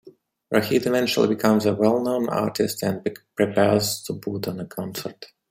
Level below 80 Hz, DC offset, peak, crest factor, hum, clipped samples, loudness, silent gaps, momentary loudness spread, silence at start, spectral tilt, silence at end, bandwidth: -62 dBFS; under 0.1%; -4 dBFS; 20 dB; none; under 0.1%; -23 LUFS; none; 11 LU; 0.05 s; -5 dB/octave; 0.25 s; 16 kHz